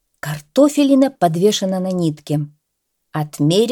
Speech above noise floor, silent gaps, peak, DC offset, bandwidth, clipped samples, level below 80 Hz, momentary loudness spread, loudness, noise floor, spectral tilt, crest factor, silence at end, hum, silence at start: 57 dB; none; -2 dBFS; under 0.1%; 17.5 kHz; under 0.1%; -62 dBFS; 14 LU; -17 LUFS; -73 dBFS; -6 dB/octave; 14 dB; 0 s; none; 0.25 s